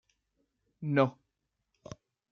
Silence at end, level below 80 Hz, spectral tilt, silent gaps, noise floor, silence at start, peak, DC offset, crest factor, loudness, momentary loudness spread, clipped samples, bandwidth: 1.2 s; -72 dBFS; -8 dB/octave; none; -83 dBFS; 0.8 s; -12 dBFS; under 0.1%; 24 dB; -31 LUFS; 22 LU; under 0.1%; 6.8 kHz